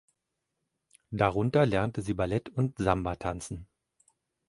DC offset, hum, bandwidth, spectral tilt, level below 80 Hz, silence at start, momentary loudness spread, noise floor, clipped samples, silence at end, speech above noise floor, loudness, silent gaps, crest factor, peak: under 0.1%; none; 11.5 kHz; -7 dB/octave; -50 dBFS; 1.1 s; 14 LU; -84 dBFS; under 0.1%; 0.85 s; 55 dB; -29 LUFS; none; 22 dB; -8 dBFS